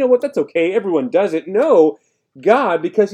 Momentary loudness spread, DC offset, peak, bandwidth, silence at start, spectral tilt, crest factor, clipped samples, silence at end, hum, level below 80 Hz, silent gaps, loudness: 5 LU; under 0.1%; 0 dBFS; 9 kHz; 0 s; -6.5 dB/octave; 16 dB; under 0.1%; 0 s; none; -74 dBFS; none; -16 LUFS